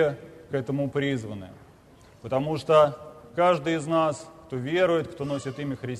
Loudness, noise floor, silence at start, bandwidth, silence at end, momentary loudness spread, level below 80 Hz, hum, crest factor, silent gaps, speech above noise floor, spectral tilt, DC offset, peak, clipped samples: -26 LUFS; -53 dBFS; 0 s; 13 kHz; 0 s; 17 LU; -60 dBFS; none; 18 dB; none; 28 dB; -6.5 dB/octave; under 0.1%; -8 dBFS; under 0.1%